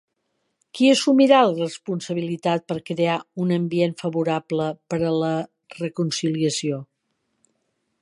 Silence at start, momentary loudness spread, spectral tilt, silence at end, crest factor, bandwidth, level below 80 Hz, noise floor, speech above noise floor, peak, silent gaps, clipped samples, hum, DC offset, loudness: 0.75 s; 13 LU; -5.5 dB/octave; 1.2 s; 20 dB; 11.5 kHz; -66 dBFS; -74 dBFS; 53 dB; -2 dBFS; none; under 0.1%; none; under 0.1%; -22 LUFS